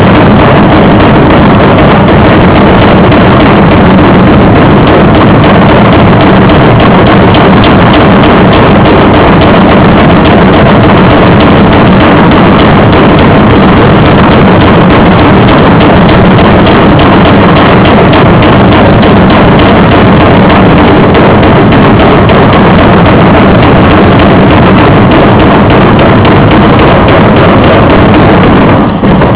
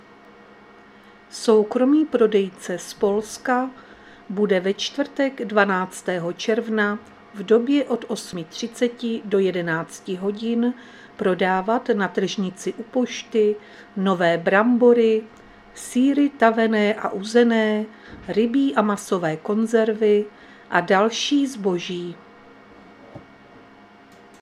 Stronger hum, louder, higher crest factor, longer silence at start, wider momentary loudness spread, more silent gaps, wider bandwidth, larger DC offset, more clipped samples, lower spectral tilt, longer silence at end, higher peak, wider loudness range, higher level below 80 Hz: neither; first, -2 LUFS vs -21 LUFS; second, 2 dB vs 20 dB; second, 0 s vs 1.35 s; second, 0 LU vs 13 LU; neither; second, 4 kHz vs 13.5 kHz; neither; first, 30% vs under 0.1%; first, -11 dB/octave vs -5 dB/octave; second, 0 s vs 0.85 s; about the same, 0 dBFS vs -2 dBFS; second, 0 LU vs 5 LU; first, -14 dBFS vs -64 dBFS